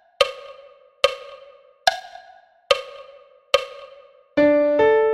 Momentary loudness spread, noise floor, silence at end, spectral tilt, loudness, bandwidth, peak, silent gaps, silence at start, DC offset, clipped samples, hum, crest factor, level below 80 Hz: 25 LU; -50 dBFS; 0 s; -3 dB/octave; -20 LUFS; 14.5 kHz; 0 dBFS; none; 0.2 s; under 0.1%; under 0.1%; none; 22 dB; -58 dBFS